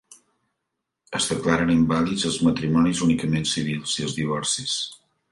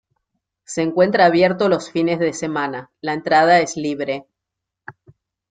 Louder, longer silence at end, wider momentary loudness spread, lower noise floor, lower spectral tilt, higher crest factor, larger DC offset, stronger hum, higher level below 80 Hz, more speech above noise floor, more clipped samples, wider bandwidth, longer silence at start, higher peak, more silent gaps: second, -23 LUFS vs -18 LUFS; second, 0.35 s vs 0.6 s; second, 6 LU vs 13 LU; about the same, -81 dBFS vs -82 dBFS; about the same, -4.5 dB/octave vs -5 dB/octave; about the same, 18 dB vs 16 dB; neither; neither; first, -50 dBFS vs -62 dBFS; second, 59 dB vs 65 dB; neither; first, 11.5 kHz vs 9.4 kHz; first, 1.1 s vs 0.7 s; second, -6 dBFS vs -2 dBFS; neither